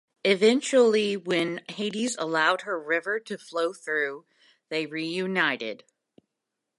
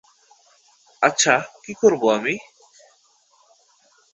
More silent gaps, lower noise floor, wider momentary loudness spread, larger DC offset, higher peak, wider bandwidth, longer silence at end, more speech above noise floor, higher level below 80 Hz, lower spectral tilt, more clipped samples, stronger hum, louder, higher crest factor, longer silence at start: neither; first, -84 dBFS vs -59 dBFS; about the same, 11 LU vs 11 LU; neither; second, -8 dBFS vs -2 dBFS; first, 11.5 kHz vs 8.2 kHz; second, 1 s vs 1.75 s; first, 58 dB vs 40 dB; second, -82 dBFS vs -68 dBFS; about the same, -3.5 dB/octave vs -2.5 dB/octave; neither; neither; second, -26 LUFS vs -19 LUFS; about the same, 20 dB vs 22 dB; second, 0.25 s vs 1 s